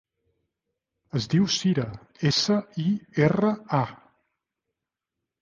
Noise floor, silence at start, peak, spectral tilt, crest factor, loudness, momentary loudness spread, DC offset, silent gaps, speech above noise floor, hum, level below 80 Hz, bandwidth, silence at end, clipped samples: -86 dBFS; 1.15 s; -6 dBFS; -5.5 dB/octave; 20 dB; -25 LUFS; 9 LU; under 0.1%; none; 62 dB; none; -58 dBFS; 7.4 kHz; 1.45 s; under 0.1%